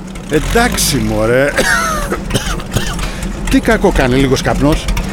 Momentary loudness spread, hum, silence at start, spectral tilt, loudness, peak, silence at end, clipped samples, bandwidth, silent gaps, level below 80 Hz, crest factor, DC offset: 7 LU; none; 0 s; -4.5 dB/octave; -13 LUFS; 0 dBFS; 0 s; under 0.1%; 18 kHz; none; -22 dBFS; 12 dB; under 0.1%